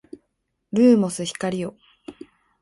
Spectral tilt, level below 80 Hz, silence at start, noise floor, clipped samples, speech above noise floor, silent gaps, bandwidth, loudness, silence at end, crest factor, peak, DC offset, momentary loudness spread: -5.5 dB/octave; -64 dBFS; 0.75 s; -75 dBFS; under 0.1%; 55 dB; none; 11.5 kHz; -21 LUFS; 0.5 s; 18 dB; -6 dBFS; under 0.1%; 22 LU